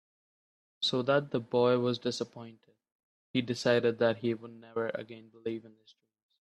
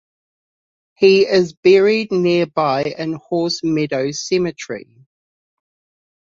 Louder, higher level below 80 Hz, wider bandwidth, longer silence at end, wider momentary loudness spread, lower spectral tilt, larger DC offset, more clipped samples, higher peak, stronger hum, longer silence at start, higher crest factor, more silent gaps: second, -31 LUFS vs -16 LUFS; second, -74 dBFS vs -60 dBFS; first, 11 kHz vs 7.6 kHz; second, 0.8 s vs 1.5 s; first, 14 LU vs 11 LU; about the same, -5.5 dB/octave vs -5 dB/octave; neither; neither; second, -12 dBFS vs -2 dBFS; neither; second, 0.8 s vs 1 s; about the same, 20 dB vs 16 dB; first, 2.92-3.34 s vs 1.57-1.63 s